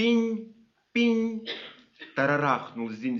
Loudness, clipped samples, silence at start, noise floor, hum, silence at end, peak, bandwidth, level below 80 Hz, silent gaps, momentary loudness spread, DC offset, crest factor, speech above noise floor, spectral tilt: -27 LUFS; under 0.1%; 0 s; -49 dBFS; none; 0 s; -10 dBFS; 6.8 kHz; -76 dBFS; none; 13 LU; under 0.1%; 18 dB; 23 dB; -3.5 dB/octave